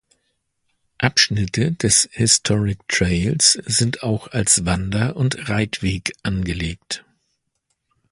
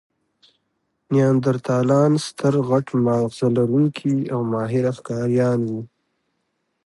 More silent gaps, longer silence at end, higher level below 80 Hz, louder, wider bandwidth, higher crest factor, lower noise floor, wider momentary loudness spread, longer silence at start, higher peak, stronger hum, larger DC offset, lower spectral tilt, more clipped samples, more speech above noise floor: neither; first, 1.15 s vs 1 s; first, -38 dBFS vs -62 dBFS; about the same, -18 LUFS vs -20 LUFS; about the same, 11.5 kHz vs 11.5 kHz; about the same, 20 dB vs 16 dB; about the same, -73 dBFS vs -73 dBFS; first, 10 LU vs 6 LU; about the same, 1 s vs 1.1 s; first, 0 dBFS vs -4 dBFS; neither; neither; second, -3 dB/octave vs -7.5 dB/octave; neither; about the same, 53 dB vs 54 dB